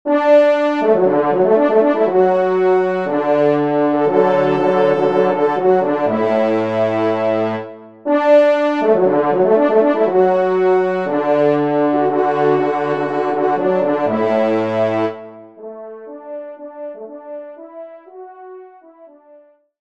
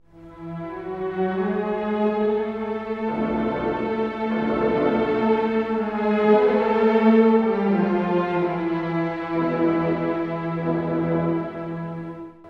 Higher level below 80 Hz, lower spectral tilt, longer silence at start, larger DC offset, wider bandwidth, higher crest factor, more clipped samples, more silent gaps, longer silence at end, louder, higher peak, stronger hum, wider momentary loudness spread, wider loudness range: second, -66 dBFS vs -52 dBFS; about the same, -8 dB/octave vs -9 dB/octave; about the same, 0.05 s vs 0.15 s; first, 0.3% vs under 0.1%; first, 7.4 kHz vs 5.8 kHz; about the same, 14 dB vs 16 dB; neither; neither; first, 0.75 s vs 0 s; first, -15 LUFS vs -22 LUFS; first, 0 dBFS vs -6 dBFS; neither; first, 19 LU vs 13 LU; first, 18 LU vs 5 LU